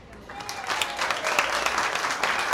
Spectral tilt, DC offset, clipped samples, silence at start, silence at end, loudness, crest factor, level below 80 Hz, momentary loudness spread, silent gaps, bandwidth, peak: -0.5 dB/octave; under 0.1%; under 0.1%; 0 s; 0 s; -25 LUFS; 22 dB; -56 dBFS; 11 LU; none; 19 kHz; -6 dBFS